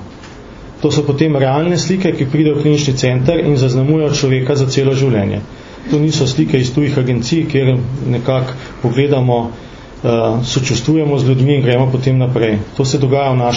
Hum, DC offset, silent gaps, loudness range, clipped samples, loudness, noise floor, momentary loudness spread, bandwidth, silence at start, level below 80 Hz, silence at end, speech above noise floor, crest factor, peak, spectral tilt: none; under 0.1%; none; 2 LU; under 0.1%; -14 LUFS; -33 dBFS; 8 LU; 7.6 kHz; 0 s; -40 dBFS; 0 s; 20 dB; 14 dB; 0 dBFS; -6.5 dB/octave